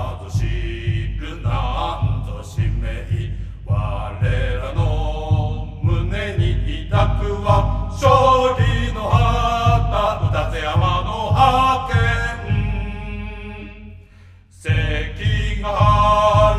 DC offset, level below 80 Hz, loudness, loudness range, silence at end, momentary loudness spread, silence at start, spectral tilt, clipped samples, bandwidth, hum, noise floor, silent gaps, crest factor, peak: under 0.1%; -26 dBFS; -19 LUFS; 7 LU; 0 s; 12 LU; 0 s; -6.5 dB/octave; under 0.1%; 11.5 kHz; none; -45 dBFS; none; 18 dB; 0 dBFS